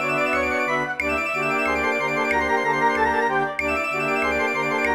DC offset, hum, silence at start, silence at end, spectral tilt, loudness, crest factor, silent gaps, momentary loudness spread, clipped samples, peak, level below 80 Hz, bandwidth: 0.2%; none; 0 s; 0 s; -4.5 dB/octave; -21 LUFS; 14 dB; none; 3 LU; under 0.1%; -8 dBFS; -46 dBFS; 16.5 kHz